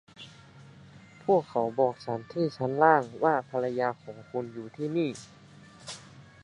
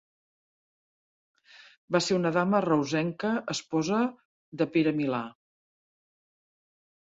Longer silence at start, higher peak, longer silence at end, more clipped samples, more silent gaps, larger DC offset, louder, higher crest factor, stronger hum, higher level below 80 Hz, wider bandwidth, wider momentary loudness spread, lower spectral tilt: second, 0.2 s vs 1.55 s; first, -6 dBFS vs -12 dBFS; second, 0.2 s vs 1.8 s; neither; second, none vs 1.77-1.88 s, 4.25-4.52 s; neither; about the same, -28 LUFS vs -28 LUFS; about the same, 24 dB vs 20 dB; neither; about the same, -70 dBFS vs -72 dBFS; first, 11 kHz vs 8 kHz; first, 21 LU vs 7 LU; about the same, -6.5 dB/octave vs -5.5 dB/octave